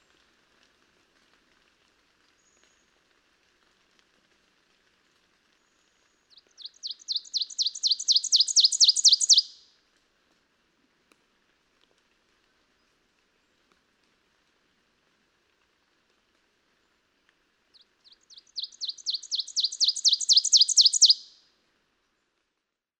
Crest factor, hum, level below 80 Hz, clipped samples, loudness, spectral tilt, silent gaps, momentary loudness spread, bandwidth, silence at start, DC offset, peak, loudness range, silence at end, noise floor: 22 dB; none; -84 dBFS; under 0.1%; -20 LUFS; 6 dB/octave; none; 21 LU; 16 kHz; 6.65 s; under 0.1%; -8 dBFS; 17 LU; 1.8 s; -83 dBFS